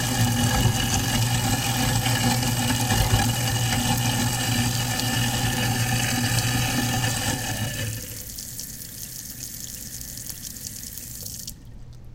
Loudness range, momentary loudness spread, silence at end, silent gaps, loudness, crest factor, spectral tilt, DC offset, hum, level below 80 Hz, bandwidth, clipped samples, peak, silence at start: 11 LU; 12 LU; 0 s; none; -24 LUFS; 18 dB; -3.5 dB/octave; under 0.1%; none; -38 dBFS; 17 kHz; under 0.1%; -6 dBFS; 0 s